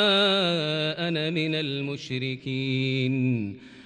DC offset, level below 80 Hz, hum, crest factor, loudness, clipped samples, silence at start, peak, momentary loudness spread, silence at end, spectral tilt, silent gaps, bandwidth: under 0.1%; -68 dBFS; none; 16 dB; -26 LUFS; under 0.1%; 0 s; -10 dBFS; 9 LU; 0 s; -6 dB/octave; none; 10 kHz